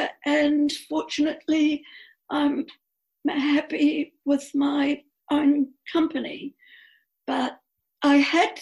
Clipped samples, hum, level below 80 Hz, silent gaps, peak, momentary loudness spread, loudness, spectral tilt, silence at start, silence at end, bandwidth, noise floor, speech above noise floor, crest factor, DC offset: under 0.1%; none; -66 dBFS; none; -8 dBFS; 11 LU; -24 LUFS; -3.5 dB/octave; 0 s; 0 s; 12 kHz; -57 dBFS; 34 dB; 16 dB; under 0.1%